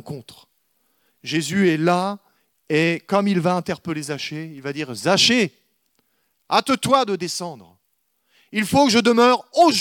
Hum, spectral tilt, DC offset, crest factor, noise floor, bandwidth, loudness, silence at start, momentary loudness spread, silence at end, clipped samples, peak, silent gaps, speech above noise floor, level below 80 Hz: none; -4 dB/octave; under 0.1%; 18 dB; -70 dBFS; 18 kHz; -20 LUFS; 0.05 s; 14 LU; 0 s; under 0.1%; -2 dBFS; none; 51 dB; -64 dBFS